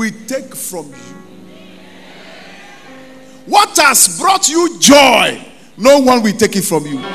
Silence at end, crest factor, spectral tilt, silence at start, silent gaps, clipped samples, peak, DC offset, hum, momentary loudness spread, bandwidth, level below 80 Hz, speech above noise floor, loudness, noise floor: 0 s; 14 dB; -2 dB/octave; 0 s; none; 0.4%; 0 dBFS; 0.8%; none; 17 LU; over 20 kHz; -50 dBFS; 26 dB; -10 LUFS; -37 dBFS